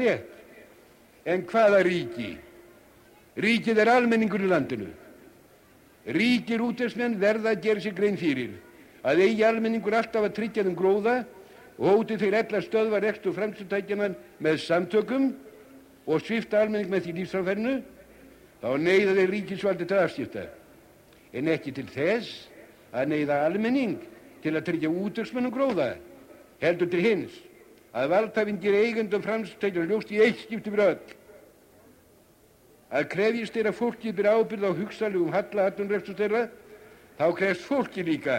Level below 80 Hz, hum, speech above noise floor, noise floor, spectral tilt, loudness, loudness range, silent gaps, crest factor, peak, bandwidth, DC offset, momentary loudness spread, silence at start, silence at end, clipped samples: -66 dBFS; none; 33 dB; -58 dBFS; -6.5 dB/octave; -26 LUFS; 4 LU; none; 18 dB; -10 dBFS; 16 kHz; under 0.1%; 12 LU; 0 s; 0 s; under 0.1%